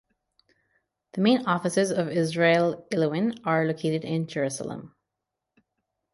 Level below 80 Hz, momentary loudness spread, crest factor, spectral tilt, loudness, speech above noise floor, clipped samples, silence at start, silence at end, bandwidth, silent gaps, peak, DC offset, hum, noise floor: -70 dBFS; 9 LU; 18 dB; -5.5 dB/octave; -25 LUFS; 60 dB; under 0.1%; 1.15 s; 1.25 s; 11.5 kHz; none; -8 dBFS; under 0.1%; none; -85 dBFS